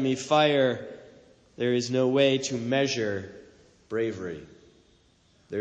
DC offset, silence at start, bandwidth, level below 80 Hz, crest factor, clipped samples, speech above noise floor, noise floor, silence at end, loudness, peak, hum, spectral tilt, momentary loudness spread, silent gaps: under 0.1%; 0 s; 9.6 kHz; -66 dBFS; 18 dB; under 0.1%; 37 dB; -63 dBFS; 0 s; -26 LUFS; -10 dBFS; none; -4.5 dB/octave; 17 LU; none